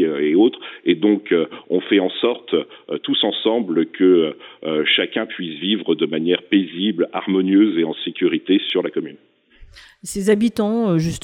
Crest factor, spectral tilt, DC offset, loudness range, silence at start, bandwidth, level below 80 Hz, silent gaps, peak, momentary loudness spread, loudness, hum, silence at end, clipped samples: 16 dB; -5.5 dB/octave; under 0.1%; 2 LU; 0 s; 14 kHz; -54 dBFS; none; -4 dBFS; 9 LU; -19 LUFS; none; 0.05 s; under 0.1%